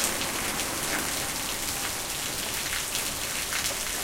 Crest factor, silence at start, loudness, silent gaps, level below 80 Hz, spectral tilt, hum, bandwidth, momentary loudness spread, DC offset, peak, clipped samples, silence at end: 26 dB; 0 s; -28 LUFS; none; -48 dBFS; -1 dB/octave; none; 17 kHz; 2 LU; under 0.1%; -4 dBFS; under 0.1%; 0 s